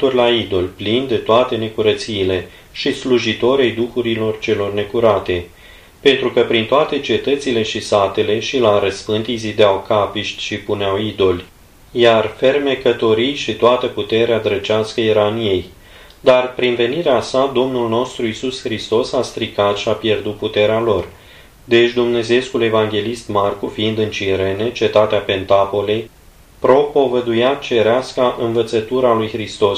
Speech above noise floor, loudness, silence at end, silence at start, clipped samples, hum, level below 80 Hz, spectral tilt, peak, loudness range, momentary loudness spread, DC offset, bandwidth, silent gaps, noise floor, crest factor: 26 dB; -16 LUFS; 0 s; 0 s; under 0.1%; none; -46 dBFS; -5 dB/octave; 0 dBFS; 2 LU; 7 LU; under 0.1%; 14.5 kHz; none; -42 dBFS; 16 dB